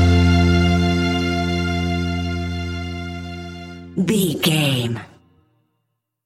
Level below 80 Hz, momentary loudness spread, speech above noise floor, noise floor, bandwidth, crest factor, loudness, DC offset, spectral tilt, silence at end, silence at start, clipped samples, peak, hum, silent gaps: -32 dBFS; 16 LU; 55 dB; -74 dBFS; 15 kHz; 16 dB; -19 LUFS; under 0.1%; -5.5 dB/octave; 1.2 s; 0 s; under 0.1%; -4 dBFS; none; none